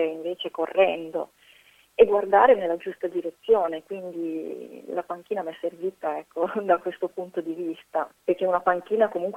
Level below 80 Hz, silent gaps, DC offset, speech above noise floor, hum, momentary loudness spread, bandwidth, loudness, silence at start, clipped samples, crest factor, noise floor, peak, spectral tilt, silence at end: -66 dBFS; none; under 0.1%; 32 dB; none; 14 LU; 13.5 kHz; -25 LUFS; 0 s; under 0.1%; 22 dB; -57 dBFS; -4 dBFS; -6 dB/octave; 0 s